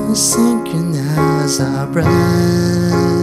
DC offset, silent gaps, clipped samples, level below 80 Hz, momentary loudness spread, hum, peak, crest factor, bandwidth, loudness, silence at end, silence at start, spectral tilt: under 0.1%; none; under 0.1%; -42 dBFS; 5 LU; none; -2 dBFS; 12 dB; 15.5 kHz; -14 LUFS; 0 s; 0 s; -5 dB/octave